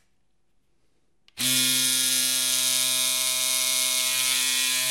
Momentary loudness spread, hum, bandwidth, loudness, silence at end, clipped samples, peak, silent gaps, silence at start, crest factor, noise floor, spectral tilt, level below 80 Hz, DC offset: 2 LU; none; 16.5 kHz; -21 LUFS; 0 s; under 0.1%; -4 dBFS; none; 1.35 s; 20 dB; -74 dBFS; 1 dB/octave; -74 dBFS; under 0.1%